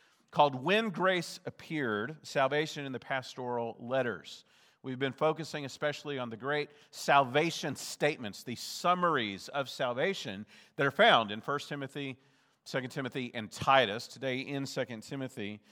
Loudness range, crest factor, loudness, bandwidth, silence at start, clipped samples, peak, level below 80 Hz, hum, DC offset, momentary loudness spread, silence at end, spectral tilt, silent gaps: 5 LU; 24 dB; -32 LUFS; 19 kHz; 0.3 s; under 0.1%; -10 dBFS; -80 dBFS; none; under 0.1%; 14 LU; 0.15 s; -4.5 dB/octave; none